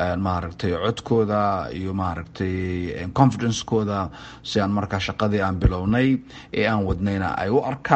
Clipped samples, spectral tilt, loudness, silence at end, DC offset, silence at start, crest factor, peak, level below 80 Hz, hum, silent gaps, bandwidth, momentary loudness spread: under 0.1%; -6.5 dB/octave; -23 LUFS; 0 s; under 0.1%; 0 s; 22 dB; -2 dBFS; -36 dBFS; none; none; 8.4 kHz; 8 LU